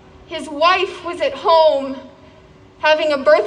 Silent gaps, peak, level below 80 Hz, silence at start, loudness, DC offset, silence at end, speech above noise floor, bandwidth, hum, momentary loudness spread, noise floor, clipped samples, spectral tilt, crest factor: none; -2 dBFS; -54 dBFS; 0.3 s; -16 LUFS; under 0.1%; 0 s; 29 dB; 10 kHz; none; 16 LU; -45 dBFS; under 0.1%; -3.5 dB/octave; 16 dB